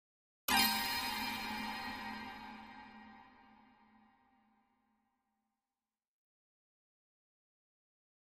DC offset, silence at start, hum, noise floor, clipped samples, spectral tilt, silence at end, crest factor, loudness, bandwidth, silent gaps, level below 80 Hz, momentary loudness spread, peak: under 0.1%; 0.5 s; none; under -90 dBFS; under 0.1%; -1 dB/octave; 4.85 s; 28 dB; -36 LUFS; 15.5 kHz; none; -68 dBFS; 24 LU; -16 dBFS